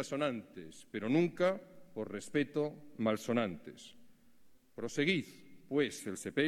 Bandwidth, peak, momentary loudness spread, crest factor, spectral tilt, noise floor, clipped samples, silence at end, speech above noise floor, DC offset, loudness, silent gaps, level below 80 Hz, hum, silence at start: 14.5 kHz; -18 dBFS; 19 LU; 18 dB; -5.5 dB/octave; -64 dBFS; under 0.1%; 0 s; 29 dB; under 0.1%; -36 LUFS; none; -74 dBFS; none; 0 s